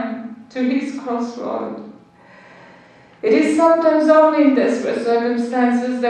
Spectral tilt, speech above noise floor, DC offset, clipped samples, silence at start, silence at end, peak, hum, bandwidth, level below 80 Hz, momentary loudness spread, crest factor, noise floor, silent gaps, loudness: -5.5 dB/octave; 30 dB; under 0.1%; under 0.1%; 0 s; 0 s; 0 dBFS; none; 9.8 kHz; -70 dBFS; 14 LU; 16 dB; -47 dBFS; none; -17 LUFS